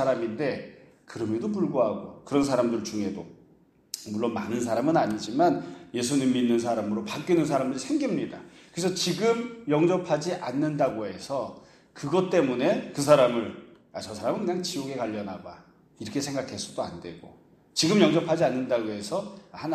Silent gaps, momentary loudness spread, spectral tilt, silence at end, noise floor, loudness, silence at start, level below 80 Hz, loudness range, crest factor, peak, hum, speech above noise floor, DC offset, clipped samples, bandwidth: none; 15 LU; -5 dB/octave; 0 s; -60 dBFS; -27 LUFS; 0 s; -66 dBFS; 5 LU; 22 dB; -4 dBFS; none; 33 dB; under 0.1%; under 0.1%; 14 kHz